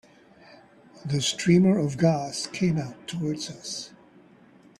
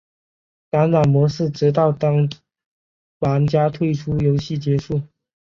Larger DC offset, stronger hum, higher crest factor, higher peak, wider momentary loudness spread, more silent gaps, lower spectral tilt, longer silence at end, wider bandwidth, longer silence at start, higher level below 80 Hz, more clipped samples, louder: neither; neither; about the same, 18 dB vs 14 dB; second, -8 dBFS vs -4 dBFS; first, 15 LU vs 8 LU; second, none vs 2.66-3.21 s; second, -5.5 dB/octave vs -8.5 dB/octave; first, 0.9 s vs 0.35 s; first, 12 kHz vs 7 kHz; second, 0.5 s vs 0.75 s; second, -62 dBFS vs -48 dBFS; neither; second, -25 LUFS vs -19 LUFS